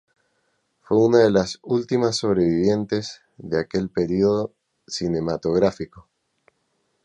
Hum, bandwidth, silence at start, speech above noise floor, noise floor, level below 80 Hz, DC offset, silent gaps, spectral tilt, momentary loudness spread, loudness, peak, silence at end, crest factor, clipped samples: none; 10 kHz; 0.9 s; 50 dB; -71 dBFS; -52 dBFS; under 0.1%; none; -6 dB/octave; 15 LU; -21 LUFS; -2 dBFS; 1.05 s; 20 dB; under 0.1%